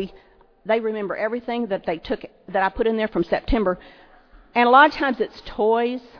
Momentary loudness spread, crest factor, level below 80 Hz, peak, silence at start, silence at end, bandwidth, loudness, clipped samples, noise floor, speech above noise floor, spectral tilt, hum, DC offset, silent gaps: 13 LU; 20 dB; -40 dBFS; -2 dBFS; 0 s; 0 s; 5.4 kHz; -21 LUFS; under 0.1%; -50 dBFS; 29 dB; -7 dB/octave; none; under 0.1%; none